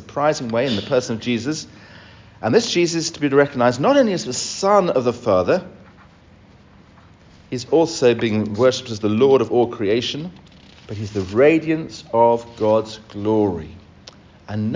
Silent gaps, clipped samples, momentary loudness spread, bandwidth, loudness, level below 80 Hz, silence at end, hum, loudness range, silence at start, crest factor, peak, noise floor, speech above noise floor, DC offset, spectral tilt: none; under 0.1%; 13 LU; 7.6 kHz; -19 LUFS; -50 dBFS; 0 s; none; 4 LU; 0 s; 18 dB; -2 dBFS; -48 dBFS; 30 dB; under 0.1%; -5 dB/octave